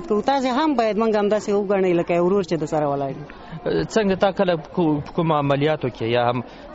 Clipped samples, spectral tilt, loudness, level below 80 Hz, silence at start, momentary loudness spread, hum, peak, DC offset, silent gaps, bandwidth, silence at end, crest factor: under 0.1%; -5.5 dB/octave; -21 LUFS; -50 dBFS; 0 s; 5 LU; none; -6 dBFS; under 0.1%; none; 8 kHz; 0 s; 14 dB